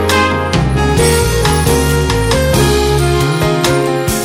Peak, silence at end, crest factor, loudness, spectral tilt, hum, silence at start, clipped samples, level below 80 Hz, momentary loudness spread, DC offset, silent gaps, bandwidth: 0 dBFS; 0 s; 12 dB; -12 LUFS; -5 dB/octave; none; 0 s; under 0.1%; -20 dBFS; 2 LU; under 0.1%; none; 17 kHz